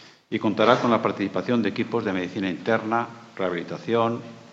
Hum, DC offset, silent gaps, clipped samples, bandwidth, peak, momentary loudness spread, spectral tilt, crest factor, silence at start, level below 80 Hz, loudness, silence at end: none; under 0.1%; none; under 0.1%; 7.8 kHz; 0 dBFS; 10 LU; -6.5 dB/octave; 24 dB; 0 s; -72 dBFS; -24 LUFS; 0 s